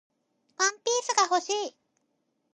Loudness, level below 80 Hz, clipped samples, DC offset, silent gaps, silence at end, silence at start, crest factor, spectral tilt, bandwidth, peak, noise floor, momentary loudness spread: -26 LUFS; under -90 dBFS; under 0.1%; under 0.1%; none; 0.85 s; 0.6 s; 22 dB; 1.5 dB/octave; 11 kHz; -8 dBFS; -76 dBFS; 7 LU